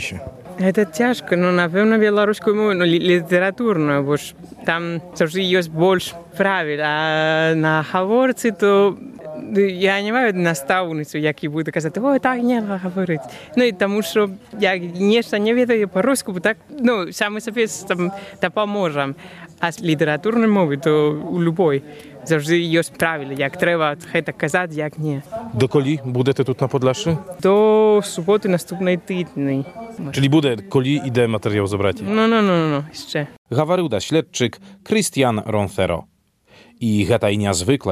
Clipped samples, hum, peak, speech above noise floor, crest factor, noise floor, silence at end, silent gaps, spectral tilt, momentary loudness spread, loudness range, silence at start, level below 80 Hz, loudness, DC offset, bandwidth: under 0.1%; none; -2 dBFS; 33 dB; 18 dB; -51 dBFS; 0 s; 33.38-33.45 s; -5.5 dB/octave; 8 LU; 3 LU; 0 s; -58 dBFS; -19 LUFS; under 0.1%; 14.5 kHz